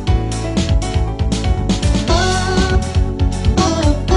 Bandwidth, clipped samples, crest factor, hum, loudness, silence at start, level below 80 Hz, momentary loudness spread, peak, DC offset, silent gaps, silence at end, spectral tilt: 11 kHz; under 0.1%; 14 dB; none; -17 LUFS; 0 s; -20 dBFS; 4 LU; 0 dBFS; 0.4%; none; 0 s; -5.5 dB/octave